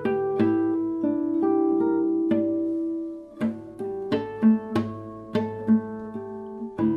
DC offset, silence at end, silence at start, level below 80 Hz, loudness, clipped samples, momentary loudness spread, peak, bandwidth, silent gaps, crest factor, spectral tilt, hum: under 0.1%; 0 s; 0 s; -62 dBFS; -25 LUFS; under 0.1%; 13 LU; -10 dBFS; 5.6 kHz; none; 16 dB; -9 dB/octave; none